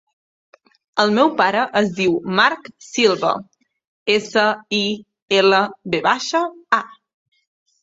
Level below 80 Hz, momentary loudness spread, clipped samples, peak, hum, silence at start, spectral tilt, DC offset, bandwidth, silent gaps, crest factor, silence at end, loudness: -62 dBFS; 10 LU; under 0.1%; -2 dBFS; none; 0.95 s; -4 dB/octave; under 0.1%; 8 kHz; 3.87-4.06 s, 5.22-5.28 s; 18 dB; 0.9 s; -18 LUFS